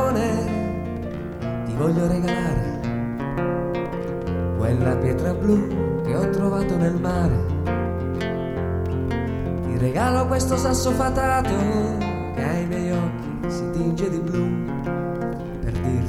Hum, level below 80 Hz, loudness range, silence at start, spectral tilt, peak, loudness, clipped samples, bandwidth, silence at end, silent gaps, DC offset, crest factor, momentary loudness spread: none; -36 dBFS; 3 LU; 0 s; -7 dB/octave; -8 dBFS; -23 LUFS; under 0.1%; 15 kHz; 0 s; none; 0.1%; 14 dB; 7 LU